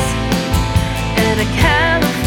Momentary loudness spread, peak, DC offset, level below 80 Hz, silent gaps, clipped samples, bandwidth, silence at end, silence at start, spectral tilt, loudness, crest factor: 5 LU; 0 dBFS; under 0.1%; -24 dBFS; none; under 0.1%; 19 kHz; 0 s; 0 s; -5 dB/octave; -15 LUFS; 14 dB